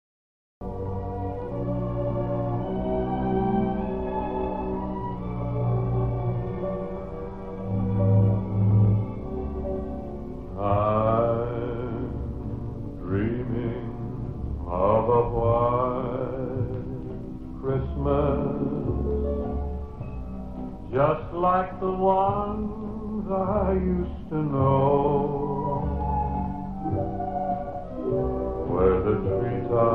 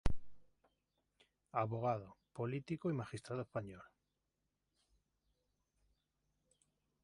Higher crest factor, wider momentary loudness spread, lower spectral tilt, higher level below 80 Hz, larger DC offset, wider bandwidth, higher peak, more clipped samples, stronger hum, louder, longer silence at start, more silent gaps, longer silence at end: second, 18 dB vs 24 dB; about the same, 12 LU vs 14 LU; first, -11.5 dB/octave vs -7.5 dB/octave; first, -36 dBFS vs -54 dBFS; first, 0.5% vs under 0.1%; second, 4 kHz vs 11 kHz; first, -8 dBFS vs -20 dBFS; neither; second, none vs 50 Hz at -70 dBFS; first, -27 LUFS vs -43 LUFS; first, 0.6 s vs 0.05 s; neither; second, 0 s vs 3.2 s